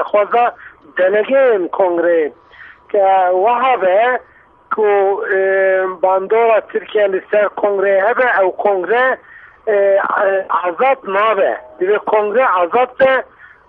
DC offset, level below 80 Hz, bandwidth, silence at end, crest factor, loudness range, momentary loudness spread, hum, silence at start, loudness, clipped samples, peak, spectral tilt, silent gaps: under 0.1%; -60 dBFS; 4.1 kHz; 0.45 s; 14 dB; 1 LU; 5 LU; none; 0 s; -14 LUFS; under 0.1%; -2 dBFS; -7.5 dB/octave; none